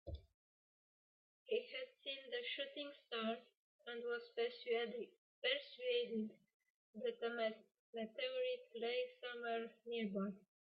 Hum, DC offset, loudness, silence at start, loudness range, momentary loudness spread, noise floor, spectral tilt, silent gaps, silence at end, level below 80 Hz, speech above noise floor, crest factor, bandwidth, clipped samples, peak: none; under 0.1%; -45 LUFS; 0.05 s; 3 LU; 10 LU; under -90 dBFS; -2 dB/octave; 0.34-1.46 s, 3.57-3.79 s, 5.18-5.42 s, 6.54-6.60 s, 6.70-6.93 s, 7.79-7.93 s; 0.3 s; -72 dBFS; over 46 dB; 20 dB; 5.6 kHz; under 0.1%; -26 dBFS